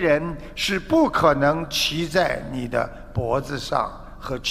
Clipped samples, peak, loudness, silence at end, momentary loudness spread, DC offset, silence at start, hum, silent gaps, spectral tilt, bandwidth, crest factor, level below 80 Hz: under 0.1%; -2 dBFS; -22 LUFS; 0 s; 11 LU; under 0.1%; 0 s; none; none; -4.5 dB/octave; 15.5 kHz; 20 dB; -40 dBFS